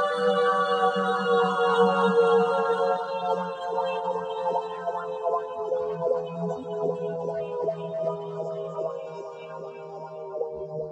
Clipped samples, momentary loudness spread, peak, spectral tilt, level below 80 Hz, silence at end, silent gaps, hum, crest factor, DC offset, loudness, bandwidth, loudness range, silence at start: under 0.1%; 15 LU; -10 dBFS; -6 dB/octave; -72 dBFS; 0 s; none; none; 16 dB; under 0.1%; -26 LUFS; 9.4 kHz; 10 LU; 0 s